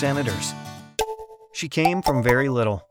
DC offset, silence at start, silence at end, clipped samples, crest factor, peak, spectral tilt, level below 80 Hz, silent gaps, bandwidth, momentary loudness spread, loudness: under 0.1%; 0 s; 0.1 s; under 0.1%; 18 dB; -6 dBFS; -5 dB/octave; -44 dBFS; none; over 20 kHz; 14 LU; -23 LUFS